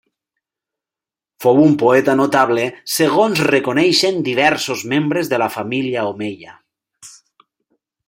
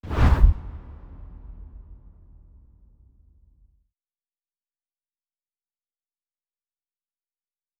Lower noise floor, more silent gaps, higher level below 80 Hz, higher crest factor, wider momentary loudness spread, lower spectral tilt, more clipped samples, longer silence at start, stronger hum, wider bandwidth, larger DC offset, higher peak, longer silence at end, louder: about the same, -89 dBFS vs under -90 dBFS; neither; second, -62 dBFS vs -30 dBFS; second, 16 dB vs 26 dB; second, 9 LU vs 27 LU; second, -4.5 dB/octave vs -8 dB/octave; neither; first, 1.4 s vs 0.05 s; neither; first, 16.5 kHz vs 6.8 kHz; neither; about the same, 0 dBFS vs -2 dBFS; second, 1 s vs 6.15 s; first, -15 LUFS vs -21 LUFS